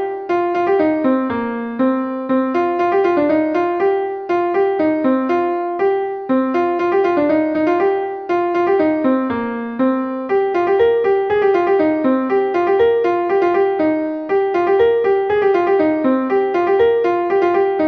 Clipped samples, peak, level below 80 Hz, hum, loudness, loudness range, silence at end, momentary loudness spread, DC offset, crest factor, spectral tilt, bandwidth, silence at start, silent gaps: under 0.1%; -4 dBFS; -54 dBFS; none; -16 LUFS; 2 LU; 0 s; 5 LU; under 0.1%; 12 dB; -7.5 dB/octave; 6.2 kHz; 0 s; none